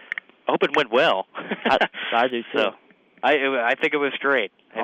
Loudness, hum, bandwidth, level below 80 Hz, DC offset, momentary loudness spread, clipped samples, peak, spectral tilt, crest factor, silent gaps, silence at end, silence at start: -22 LUFS; none; 9.4 kHz; -64 dBFS; under 0.1%; 7 LU; under 0.1%; -8 dBFS; -4.5 dB/octave; 16 dB; none; 0 s; 0.45 s